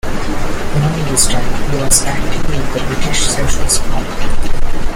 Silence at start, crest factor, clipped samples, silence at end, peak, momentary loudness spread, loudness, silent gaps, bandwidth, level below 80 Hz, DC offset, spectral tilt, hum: 0.05 s; 10 dB; under 0.1%; 0 s; 0 dBFS; 10 LU; -16 LUFS; none; 15.5 kHz; -18 dBFS; under 0.1%; -3.5 dB/octave; none